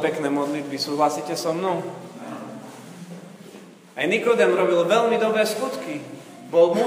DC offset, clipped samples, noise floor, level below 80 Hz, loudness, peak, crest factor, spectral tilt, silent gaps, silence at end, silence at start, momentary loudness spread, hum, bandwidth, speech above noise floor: under 0.1%; under 0.1%; -44 dBFS; -76 dBFS; -22 LUFS; -4 dBFS; 18 dB; -4.5 dB/octave; none; 0 s; 0 s; 22 LU; none; 15.5 kHz; 23 dB